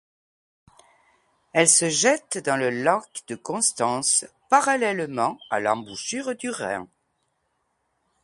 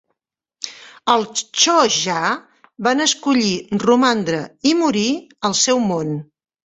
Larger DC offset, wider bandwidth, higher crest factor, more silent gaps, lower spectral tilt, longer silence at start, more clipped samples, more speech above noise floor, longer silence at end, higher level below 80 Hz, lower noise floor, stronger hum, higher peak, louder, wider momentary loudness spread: neither; first, 12 kHz vs 8.4 kHz; first, 24 dB vs 18 dB; neither; about the same, -2 dB/octave vs -3 dB/octave; first, 1.55 s vs 0.6 s; neither; second, 50 dB vs 61 dB; first, 1.35 s vs 0.4 s; second, -70 dBFS vs -60 dBFS; second, -73 dBFS vs -79 dBFS; neither; about the same, 0 dBFS vs 0 dBFS; second, -22 LUFS vs -17 LUFS; about the same, 13 LU vs 12 LU